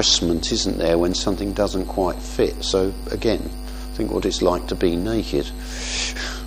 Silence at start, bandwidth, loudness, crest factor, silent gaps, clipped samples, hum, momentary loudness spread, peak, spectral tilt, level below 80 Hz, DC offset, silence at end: 0 s; 15.5 kHz; -22 LUFS; 20 dB; none; under 0.1%; none; 7 LU; -2 dBFS; -4 dB/octave; -32 dBFS; under 0.1%; 0 s